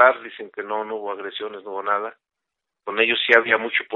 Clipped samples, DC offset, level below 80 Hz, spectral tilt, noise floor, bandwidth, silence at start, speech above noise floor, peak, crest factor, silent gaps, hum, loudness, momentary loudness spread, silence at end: under 0.1%; under 0.1%; -76 dBFS; 1.5 dB/octave; -84 dBFS; 7 kHz; 0 s; 62 dB; 0 dBFS; 22 dB; none; none; -21 LUFS; 17 LU; 0 s